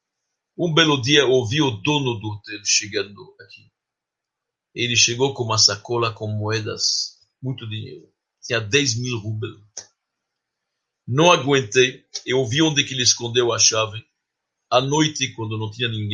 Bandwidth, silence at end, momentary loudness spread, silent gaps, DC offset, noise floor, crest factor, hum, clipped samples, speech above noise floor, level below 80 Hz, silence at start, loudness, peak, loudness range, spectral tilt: 11 kHz; 0 s; 16 LU; none; under 0.1%; -84 dBFS; 22 dB; none; under 0.1%; 64 dB; -60 dBFS; 0.6 s; -19 LUFS; 0 dBFS; 6 LU; -3 dB/octave